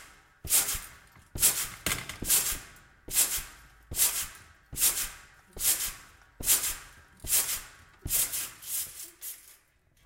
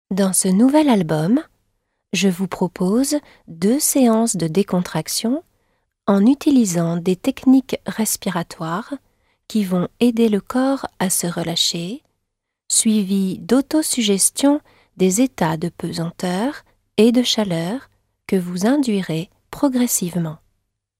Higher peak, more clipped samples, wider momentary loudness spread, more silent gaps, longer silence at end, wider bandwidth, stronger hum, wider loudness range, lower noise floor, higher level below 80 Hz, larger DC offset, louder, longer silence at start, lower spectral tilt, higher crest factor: second, -8 dBFS vs -2 dBFS; neither; first, 17 LU vs 11 LU; neither; about the same, 0.55 s vs 0.65 s; about the same, 16.5 kHz vs 16 kHz; neither; about the same, 2 LU vs 3 LU; second, -65 dBFS vs -77 dBFS; first, -50 dBFS vs -56 dBFS; neither; second, -27 LUFS vs -19 LUFS; about the same, 0 s vs 0.1 s; second, 0 dB/octave vs -4.5 dB/octave; first, 24 dB vs 18 dB